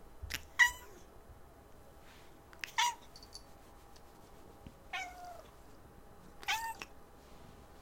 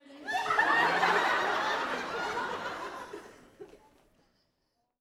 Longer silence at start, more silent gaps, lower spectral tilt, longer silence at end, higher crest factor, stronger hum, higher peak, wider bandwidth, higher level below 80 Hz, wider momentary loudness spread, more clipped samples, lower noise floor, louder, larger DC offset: about the same, 0 s vs 0.1 s; neither; second, -0.5 dB/octave vs -2.5 dB/octave; second, 0 s vs 1.25 s; first, 28 dB vs 20 dB; neither; about the same, -14 dBFS vs -12 dBFS; about the same, 16.5 kHz vs 17.5 kHz; first, -60 dBFS vs -68 dBFS; first, 26 LU vs 16 LU; neither; second, -57 dBFS vs -79 dBFS; second, -35 LUFS vs -29 LUFS; neither